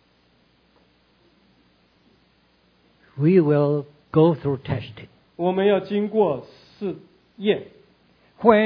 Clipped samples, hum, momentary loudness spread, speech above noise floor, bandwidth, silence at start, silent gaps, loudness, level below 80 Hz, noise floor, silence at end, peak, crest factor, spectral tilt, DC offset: under 0.1%; 60 Hz at -55 dBFS; 14 LU; 40 dB; 5.4 kHz; 3.15 s; none; -22 LUFS; -60 dBFS; -61 dBFS; 0 s; 0 dBFS; 22 dB; -10.5 dB/octave; under 0.1%